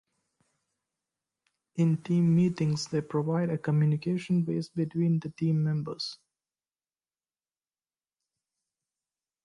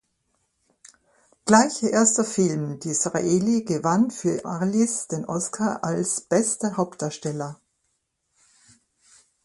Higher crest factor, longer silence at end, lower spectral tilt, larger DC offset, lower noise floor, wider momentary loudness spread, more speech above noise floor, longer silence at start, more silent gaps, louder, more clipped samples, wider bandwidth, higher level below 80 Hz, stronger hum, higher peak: second, 16 dB vs 24 dB; first, 3.3 s vs 1.9 s; first, -7.5 dB/octave vs -4.5 dB/octave; neither; first, under -90 dBFS vs -74 dBFS; second, 7 LU vs 10 LU; first, over 63 dB vs 51 dB; first, 1.75 s vs 1.45 s; neither; second, -28 LUFS vs -23 LUFS; neither; about the same, 11 kHz vs 11.5 kHz; about the same, -70 dBFS vs -66 dBFS; neither; second, -16 dBFS vs 0 dBFS